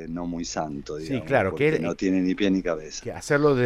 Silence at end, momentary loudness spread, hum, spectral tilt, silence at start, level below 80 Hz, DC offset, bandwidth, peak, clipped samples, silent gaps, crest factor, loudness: 0 s; 10 LU; none; -6 dB/octave; 0 s; -48 dBFS; under 0.1%; 12 kHz; -8 dBFS; under 0.1%; none; 16 dB; -25 LUFS